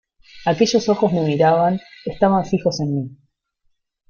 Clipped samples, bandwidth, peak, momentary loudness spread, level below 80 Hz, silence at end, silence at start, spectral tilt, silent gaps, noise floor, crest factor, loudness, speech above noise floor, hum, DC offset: under 0.1%; 7.2 kHz; -2 dBFS; 11 LU; -52 dBFS; 0.95 s; 0.35 s; -6 dB/octave; none; -67 dBFS; 16 dB; -18 LUFS; 49 dB; none; under 0.1%